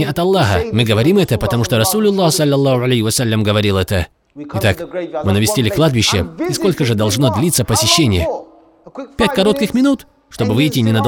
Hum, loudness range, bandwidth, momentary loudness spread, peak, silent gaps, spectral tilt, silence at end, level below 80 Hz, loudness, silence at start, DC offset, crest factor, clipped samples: none; 2 LU; 18.5 kHz; 9 LU; 0 dBFS; none; -5 dB/octave; 0 s; -38 dBFS; -14 LUFS; 0 s; under 0.1%; 14 dB; under 0.1%